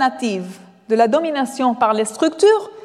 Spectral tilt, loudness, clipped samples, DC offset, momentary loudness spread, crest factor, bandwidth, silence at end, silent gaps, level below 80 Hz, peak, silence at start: -4 dB/octave; -17 LUFS; under 0.1%; under 0.1%; 9 LU; 14 dB; 13 kHz; 0.05 s; none; -70 dBFS; -4 dBFS; 0 s